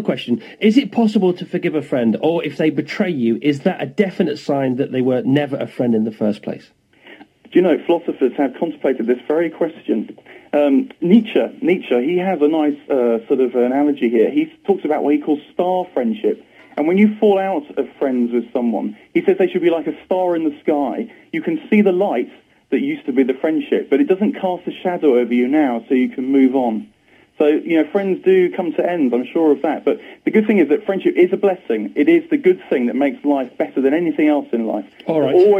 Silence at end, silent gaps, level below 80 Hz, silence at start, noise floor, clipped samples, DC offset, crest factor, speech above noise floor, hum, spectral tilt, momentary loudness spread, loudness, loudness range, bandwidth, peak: 0 s; none; -68 dBFS; 0 s; -44 dBFS; under 0.1%; under 0.1%; 16 dB; 27 dB; none; -8 dB/octave; 7 LU; -18 LUFS; 3 LU; 8.2 kHz; 0 dBFS